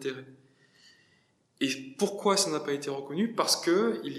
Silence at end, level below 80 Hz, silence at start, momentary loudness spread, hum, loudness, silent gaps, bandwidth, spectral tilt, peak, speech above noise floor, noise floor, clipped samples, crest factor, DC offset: 0 s; -84 dBFS; 0 s; 9 LU; none; -28 LUFS; none; 15.5 kHz; -3 dB/octave; -12 dBFS; 39 dB; -68 dBFS; under 0.1%; 20 dB; under 0.1%